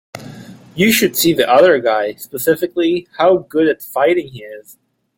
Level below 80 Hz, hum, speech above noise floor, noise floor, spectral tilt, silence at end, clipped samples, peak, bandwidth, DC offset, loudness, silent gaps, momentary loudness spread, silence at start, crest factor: -56 dBFS; none; 21 dB; -36 dBFS; -4 dB/octave; 0.55 s; under 0.1%; 0 dBFS; 17 kHz; under 0.1%; -14 LUFS; none; 22 LU; 0.15 s; 14 dB